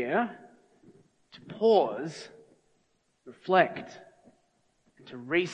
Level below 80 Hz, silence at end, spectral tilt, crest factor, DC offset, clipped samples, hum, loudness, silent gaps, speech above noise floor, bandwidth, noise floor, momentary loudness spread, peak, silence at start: -80 dBFS; 0 s; -5.5 dB/octave; 22 dB; under 0.1%; under 0.1%; none; -27 LUFS; none; 44 dB; 9.4 kHz; -72 dBFS; 24 LU; -10 dBFS; 0 s